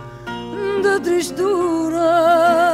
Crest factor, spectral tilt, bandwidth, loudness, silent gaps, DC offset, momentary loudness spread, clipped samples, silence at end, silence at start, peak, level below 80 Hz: 12 dB; -4.5 dB/octave; 15 kHz; -17 LUFS; none; under 0.1%; 14 LU; under 0.1%; 0 s; 0 s; -4 dBFS; -50 dBFS